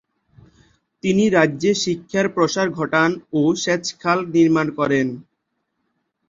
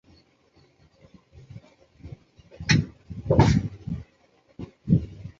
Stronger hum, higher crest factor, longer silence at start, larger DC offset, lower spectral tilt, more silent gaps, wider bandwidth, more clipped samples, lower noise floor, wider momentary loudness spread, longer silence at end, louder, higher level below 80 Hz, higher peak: neither; about the same, 18 dB vs 22 dB; second, 1.05 s vs 1.55 s; neither; second, -5 dB/octave vs -6.5 dB/octave; neither; about the same, 7.6 kHz vs 7.8 kHz; neither; first, -74 dBFS vs -62 dBFS; second, 5 LU vs 27 LU; first, 1.05 s vs 0.1 s; first, -19 LUFS vs -24 LUFS; second, -58 dBFS vs -40 dBFS; about the same, -2 dBFS vs -4 dBFS